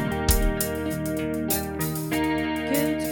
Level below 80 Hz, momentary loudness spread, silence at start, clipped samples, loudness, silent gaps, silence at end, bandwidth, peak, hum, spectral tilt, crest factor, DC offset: -32 dBFS; 5 LU; 0 s; under 0.1%; -25 LUFS; none; 0 s; 17.5 kHz; -6 dBFS; none; -4.5 dB/octave; 20 dB; under 0.1%